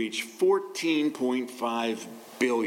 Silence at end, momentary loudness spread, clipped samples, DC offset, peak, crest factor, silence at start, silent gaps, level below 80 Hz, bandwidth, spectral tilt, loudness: 0 s; 7 LU; under 0.1%; under 0.1%; -12 dBFS; 14 dB; 0 s; none; -84 dBFS; 17 kHz; -3.5 dB/octave; -28 LUFS